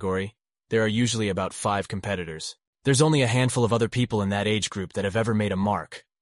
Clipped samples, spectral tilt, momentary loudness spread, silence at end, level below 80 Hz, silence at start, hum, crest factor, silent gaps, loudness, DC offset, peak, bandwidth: under 0.1%; -5 dB/octave; 9 LU; 0.2 s; -56 dBFS; 0 s; none; 18 dB; 2.67-2.73 s; -25 LUFS; under 0.1%; -8 dBFS; 11.5 kHz